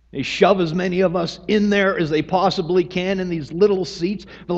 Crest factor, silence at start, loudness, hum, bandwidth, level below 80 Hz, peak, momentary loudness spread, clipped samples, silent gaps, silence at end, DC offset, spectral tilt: 18 dB; 0.15 s; -19 LUFS; none; 8 kHz; -48 dBFS; 0 dBFS; 9 LU; under 0.1%; none; 0 s; under 0.1%; -6 dB/octave